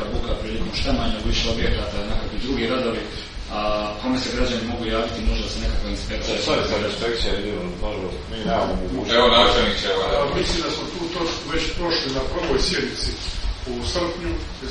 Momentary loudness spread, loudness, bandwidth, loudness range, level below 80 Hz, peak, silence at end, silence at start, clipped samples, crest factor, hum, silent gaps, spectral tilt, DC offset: 8 LU; -23 LUFS; 10.5 kHz; 5 LU; -30 dBFS; -2 dBFS; 0 s; 0 s; under 0.1%; 20 dB; none; none; -4.5 dB/octave; under 0.1%